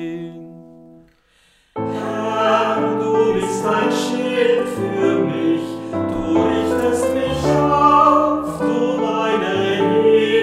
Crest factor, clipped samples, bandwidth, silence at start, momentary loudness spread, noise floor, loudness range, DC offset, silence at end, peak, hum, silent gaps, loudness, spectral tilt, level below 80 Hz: 16 dB; under 0.1%; 15 kHz; 0 s; 10 LU; -57 dBFS; 4 LU; under 0.1%; 0 s; 0 dBFS; none; none; -17 LUFS; -5.5 dB/octave; -46 dBFS